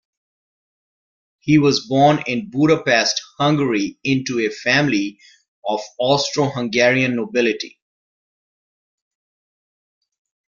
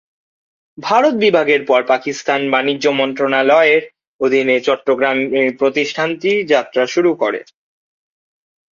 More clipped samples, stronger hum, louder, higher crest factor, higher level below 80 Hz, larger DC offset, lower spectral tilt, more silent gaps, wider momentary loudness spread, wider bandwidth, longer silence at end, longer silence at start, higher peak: neither; neither; second, -18 LUFS vs -15 LUFS; first, 20 dB vs 14 dB; first, -58 dBFS vs -64 dBFS; neither; about the same, -5 dB/octave vs -4.5 dB/octave; about the same, 5.48-5.62 s vs 4.07-4.19 s; first, 10 LU vs 6 LU; about the same, 7.4 kHz vs 7.4 kHz; first, 2.9 s vs 1.3 s; first, 1.45 s vs 0.8 s; about the same, -2 dBFS vs 0 dBFS